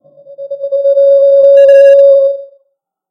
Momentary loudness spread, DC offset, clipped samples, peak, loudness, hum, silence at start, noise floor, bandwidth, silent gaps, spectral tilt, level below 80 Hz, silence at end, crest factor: 18 LU; under 0.1%; 2%; 0 dBFS; -6 LUFS; none; 0.3 s; -62 dBFS; 5.2 kHz; none; -2 dB/octave; -66 dBFS; 0.65 s; 8 dB